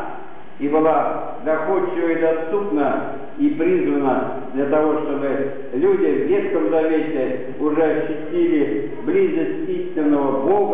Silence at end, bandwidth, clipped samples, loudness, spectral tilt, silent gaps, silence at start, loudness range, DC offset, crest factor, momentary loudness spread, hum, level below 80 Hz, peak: 0 s; 3.9 kHz; under 0.1%; -20 LUFS; -11 dB/octave; none; 0 s; 1 LU; 4%; 12 dB; 7 LU; none; -64 dBFS; -8 dBFS